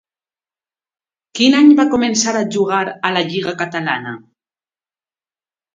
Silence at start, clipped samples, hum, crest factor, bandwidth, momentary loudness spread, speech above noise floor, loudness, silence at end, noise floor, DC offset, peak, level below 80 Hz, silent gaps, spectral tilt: 1.35 s; under 0.1%; none; 18 dB; 9.2 kHz; 13 LU; over 75 dB; -15 LUFS; 1.55 s; under -90 dBFS; under 0.1%; 0 dBFS; -60 dBFS; none; -3.5 dB/octave